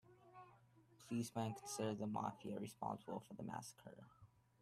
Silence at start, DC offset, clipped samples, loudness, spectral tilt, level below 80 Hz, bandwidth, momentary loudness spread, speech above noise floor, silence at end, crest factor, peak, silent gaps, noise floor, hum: 0.05 s; under 0.1%; under 0.1%; -47 LUFS; -5.5 dB/octave; -80 dBFS; 15 kHz; 20 LU; 23 dB; 0.35 s; 20 dB; -30 dBFS; none; -70 dBFS; none